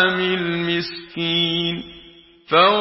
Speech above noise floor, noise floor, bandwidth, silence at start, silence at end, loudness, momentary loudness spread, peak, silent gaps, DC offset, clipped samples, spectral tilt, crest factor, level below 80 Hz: 28 dB; -47 dBFS; 5.8 kHz; 0 s; 0 s; -20 LUFS; 13 LU; -2 dBFS; none; under 0.1%; under 0.1%; -9 dB/octave; 20 dB; -56 dBFS